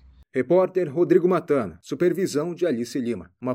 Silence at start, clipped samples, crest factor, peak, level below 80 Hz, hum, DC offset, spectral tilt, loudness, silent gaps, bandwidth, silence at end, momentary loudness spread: 0.35 s; under 0.1%; 18 dB; -6 dBFS; -60 dBFS; none; under 0.1%; -7 dB/octave; -23 LUFS; none; 15 kHz; 0 s; 11 LU